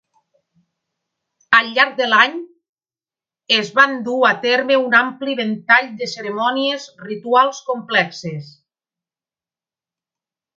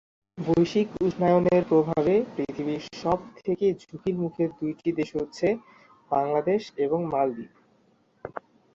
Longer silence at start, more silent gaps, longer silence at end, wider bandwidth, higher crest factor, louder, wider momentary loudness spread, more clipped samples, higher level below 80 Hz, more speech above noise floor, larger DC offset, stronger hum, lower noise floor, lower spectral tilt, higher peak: first, 1.5 s vs 0.35 s; first, 2.69-2.76 s vs none; first, 2.1 s vs 0.45 s; about the same, 7.8 kHz vs 7.6 kHz; about the same, 20 dB vs 16 dB; first, -16 LUFS vs -26 LUFS; about the same, 13 LU vs 12 LU; neither; second, -70 dBFS vs -58 dBFS; first, over 73 dB vs 39 dB; neither; neither; first, under -90 dBFS vs -64 dBFS; second, -3.5 dB/octave vs -7.5 dB/octave; first, 0 dBFS vs -10 dBFS